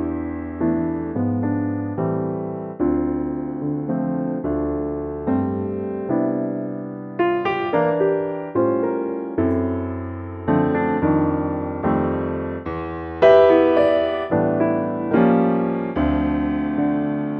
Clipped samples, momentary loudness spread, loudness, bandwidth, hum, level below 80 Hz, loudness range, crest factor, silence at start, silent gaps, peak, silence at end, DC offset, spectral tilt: under 0.1%; 10 LU; -21 LUFS; 5.6 kHz; none; -42 dBFS; 6 LU; 18 dB; 0 s; none; -4 dBFS; 0 s; under 0.1%; -10 dB/octave